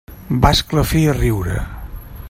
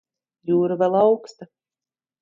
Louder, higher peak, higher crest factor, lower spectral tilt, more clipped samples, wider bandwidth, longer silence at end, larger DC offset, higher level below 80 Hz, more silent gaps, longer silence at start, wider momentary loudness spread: first, -17 LUFS vs -20 LUFS; first, 0 dBFS vs -6 dBFS; about the same, 18 dB vs 18 dB; second, -5.5 dB/octave vs -8 dB/octave; neither; first, 16.5 kHz vs 7.4 kHz; second, 0 s vs 0.75 s; neither; first, -26 dBFS vs -70 dBFS; neither; second, 0.1 s vs 0.45 s; first, 17 LU vs 8 LU